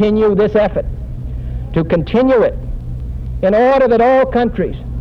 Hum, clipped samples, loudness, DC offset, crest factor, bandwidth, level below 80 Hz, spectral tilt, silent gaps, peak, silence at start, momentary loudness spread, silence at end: none; under 0.1%; -13 LUFS; under 0.1%; 12 dB; 6.4 kHz; -26 dBFS; -9 dB/octave; none; -2 dBFS; 0 s; 15 LU; 0 s